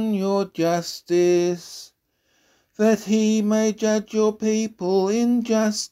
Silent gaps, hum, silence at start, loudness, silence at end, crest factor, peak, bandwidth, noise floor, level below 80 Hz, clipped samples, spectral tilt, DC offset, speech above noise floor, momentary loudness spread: none; none; 0 s; -21 LUFS; 0.05 s; 14 dB; -8 dBFS; 15 kHz; -67 dBFS; -66 dBFS; under 0.1%; -5 dB/octave; under 0.1%; 47 dB; 5 LU